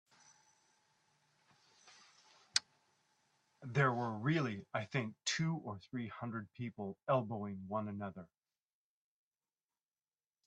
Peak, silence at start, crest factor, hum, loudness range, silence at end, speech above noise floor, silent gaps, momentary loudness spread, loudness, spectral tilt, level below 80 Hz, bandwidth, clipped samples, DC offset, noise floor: -14 dBFS; 1.85 s; 28 dB; none; 8 LU; 2.2 s; over 51 dB; none; 11 LU; -39 LUFS; -4.5 dB/octave; -80 dBFS; 11 kHz; under 0.1%; under 0.1%; under -90 dBFS